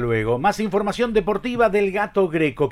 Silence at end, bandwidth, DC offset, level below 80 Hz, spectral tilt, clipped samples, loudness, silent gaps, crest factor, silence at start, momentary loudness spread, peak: 0 s; 14 kHz; under 0.1%; -42 dBFS; -6.5 dB/octave; under 0.1%; -21 LUFS; none; 14 dB; 0 s; 3 LU; -6 dBFS